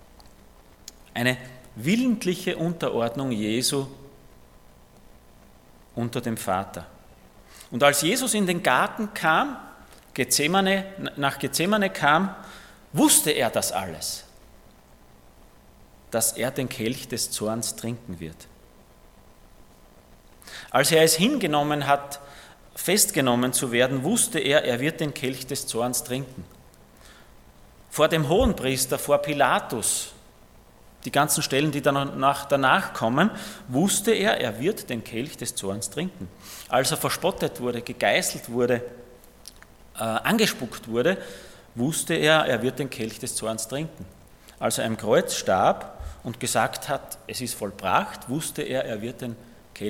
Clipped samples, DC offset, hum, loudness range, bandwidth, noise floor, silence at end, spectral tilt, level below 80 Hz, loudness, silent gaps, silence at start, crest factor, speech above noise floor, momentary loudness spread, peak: under 0.1%; under 0.1%; none; 7 LU; 17.5 kHz; -52 dBFS; 0 s; -3.5 dB/octave; -50 dBFS; -24 LUFS; none; 0.2 s; 24 dB; 28 dB; 15 LU; -2 dBFS